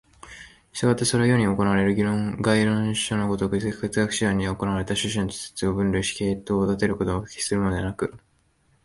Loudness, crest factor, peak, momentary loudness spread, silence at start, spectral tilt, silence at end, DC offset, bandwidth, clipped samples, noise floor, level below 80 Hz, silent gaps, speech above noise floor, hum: -24 LUFS; 18 dB; -6 dBFS; 8 LU; 0.25 s; -5 dB/octave; 0.65 s; under 0.1%; 11.5 kHz; under 0.1%; -64 dBFS; -44 dBFS; none; 41 dB; none